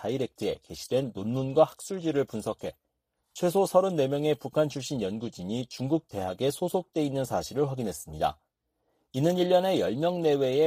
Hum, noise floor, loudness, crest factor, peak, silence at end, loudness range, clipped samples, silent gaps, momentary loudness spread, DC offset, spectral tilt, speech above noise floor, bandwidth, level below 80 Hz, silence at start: none; -79 dBFS; -29 LUFS; 20 dB; -8 dBFS; 0 s; 3 LU; under 0.1%; none; 10 LU; under 0.1%; -6 dB/octave; 51 dB; 15.5 kHz; -60 dBFS; 0 s